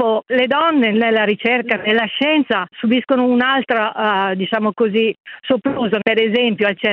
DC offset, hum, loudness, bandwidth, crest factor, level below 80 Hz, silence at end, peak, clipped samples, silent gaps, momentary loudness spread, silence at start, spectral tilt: under 0.1%; none; -16 LUFS; 5.2 kHz; 16 dB; -62 dBFS; 0 s; 0 dBFS; under 0.1%; 5.20-5.24 s; 4 LU; 0 s; -7.5 dB/octave